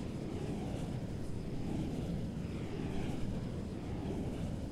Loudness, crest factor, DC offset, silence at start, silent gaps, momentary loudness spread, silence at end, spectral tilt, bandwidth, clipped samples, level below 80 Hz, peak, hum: -40 LUFS; 14 dB; under 0.1%; 0 s; none; 3 LU; 0 s; -7.5 dB/octave; 14.5 kHz; under 0.1%; -48 dBFS; -26 dBFS; none